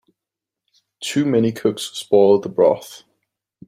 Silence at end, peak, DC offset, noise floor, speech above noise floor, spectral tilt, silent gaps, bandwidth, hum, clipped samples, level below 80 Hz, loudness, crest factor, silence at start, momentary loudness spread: 0.7 s; -2 dBFS; under 0.1%; -86 dBFS; 68 dB; -5.5 dB/octave; none; 15.5 kHz; none; under 0.1%; -64 dBFS; -18 LUFS; 18 dB; 1 s; 13 LU